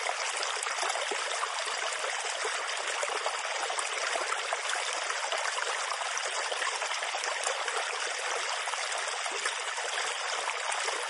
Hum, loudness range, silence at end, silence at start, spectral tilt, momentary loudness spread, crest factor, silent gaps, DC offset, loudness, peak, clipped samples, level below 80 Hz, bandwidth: none; 0 LU; 0 s; 0 s; 4 dB/octave; 1 LU; 20 dB; none; under 0.1%; -31 LUFS; -12 dBFS; under 0.1%; under -90 dBFS; 11.5 kHz